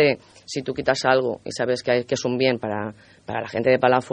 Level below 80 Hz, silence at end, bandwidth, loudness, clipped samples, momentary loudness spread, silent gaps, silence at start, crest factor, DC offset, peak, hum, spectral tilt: -60 dBFS; 0 s; 10 kHz; -23 LUFS; under 0.1%; 12 LU; none; 0 s; 20 dB; under 0.1%; -2 dBFS; none; -5 dB/octave